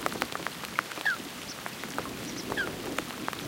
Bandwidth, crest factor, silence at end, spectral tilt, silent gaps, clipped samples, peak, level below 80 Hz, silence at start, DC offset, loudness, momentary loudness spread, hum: 17 kHz; 28 dB; 0 s; -3 dB/octave; none; under 0.1%; -6 dBFS; -60 dBFS; 0 s; under 0.1%; -34 LUFS; 7 LU; none